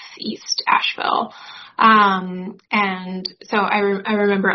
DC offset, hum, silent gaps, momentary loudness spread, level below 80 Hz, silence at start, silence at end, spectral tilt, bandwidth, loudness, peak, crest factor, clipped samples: under 0.1%; none; none; 16 LU; -66 dBFS; 0 s; 0 s; -2 dB/octave; 6.4 kHz; -18 LUFS; 0 dBFS; 20 dB; under 0.1%